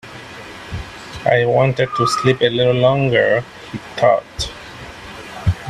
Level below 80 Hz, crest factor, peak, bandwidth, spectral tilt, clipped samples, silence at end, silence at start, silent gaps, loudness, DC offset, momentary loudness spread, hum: -40 dBFS; 18 dB; 0 dBFS; 13 kHz; -5.5 dB/octave; under 0.1%; 0 s; 0.05 s; none; -16 LUFS; under 0.1%; 19 LU; none